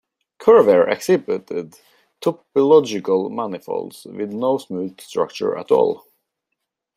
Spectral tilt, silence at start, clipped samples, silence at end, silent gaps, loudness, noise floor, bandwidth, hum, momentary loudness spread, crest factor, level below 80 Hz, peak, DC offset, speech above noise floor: -6 dB/octave; 0.4 s; under 0.1%; 1 s; none; -19 LUFS; -79 dBFS; 14.5 kHz; none; 15 LU; 18 dB; -66 dBFS; -2 dBFS; under 0.1%; 61 dB